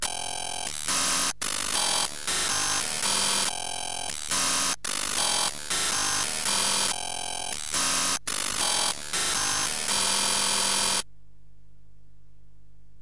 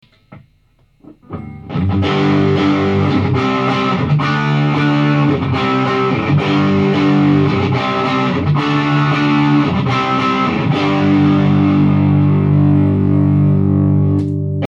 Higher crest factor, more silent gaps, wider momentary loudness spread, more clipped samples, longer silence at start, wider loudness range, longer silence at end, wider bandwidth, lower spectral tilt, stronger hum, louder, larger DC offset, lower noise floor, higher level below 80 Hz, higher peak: about the same, 16 dB vs 12 dB; neither; first, 8 LU vs 4 LU; neither; second, 0 s vs 0.3 s; about the same, 1 LU vs 3 LU; first, 2 s vs 0 s; first, 11.5 kHz vs 7.2 kHz; second, 0.5 dB/octave vs -8 dB/octave; first, 50 Hz at -55 dBFS vs none; second, -25 LUFS vs -14 LUFS; first, 1% vs under 0.1%; about the same, -57 dBFS vs -54 dBFS; second, -54 dBFS vs -46 dBFS; second, -12 dBFS vs -2 dBFS